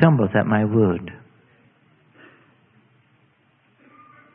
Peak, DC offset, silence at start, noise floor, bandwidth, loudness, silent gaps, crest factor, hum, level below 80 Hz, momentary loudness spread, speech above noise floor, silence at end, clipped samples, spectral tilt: 0 dBFS; under 0.1%; 0 s; -61 dBFS; 3.6 kHz; -19 LUFS; none; 24 dB; none; -60 dBFS; 12 LU; 43 dB; 3.2 s; under 0.1%; -12.5 dB/octave